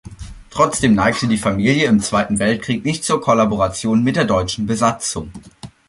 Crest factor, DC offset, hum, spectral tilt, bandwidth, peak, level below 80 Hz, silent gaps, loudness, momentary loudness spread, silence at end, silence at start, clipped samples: 16 dB; under 0.1%; none; -5 dB/octave; 11.5 kHz; -2 dBFS; -40 dBFS; none; -17 LUFS; 12 LU; 0.2 s; 0.05 s; under 0.1%